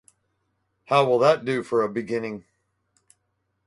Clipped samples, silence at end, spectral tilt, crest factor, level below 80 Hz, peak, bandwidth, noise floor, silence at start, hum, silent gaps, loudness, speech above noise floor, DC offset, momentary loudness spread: under 0.1%; 1.25 s; -6 dB/octave; 20 dB; -68 dBFS; -4 dBFS; 11.5 kHz; -75 dBFS; 0.9 s; none; none; -22 LUFS; 53 dB; under 0.1%; 12 LU